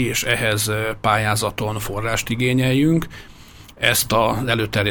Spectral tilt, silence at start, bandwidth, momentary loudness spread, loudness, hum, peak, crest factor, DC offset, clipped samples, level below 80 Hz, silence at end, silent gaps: -4 dB/octave; 0 s; over 20 kHz; 7 LU; -19 LUFS; none; -2 dBFS; 18 dB; under 0.1%; under 0.1%; -40 dBFS; 0 s; none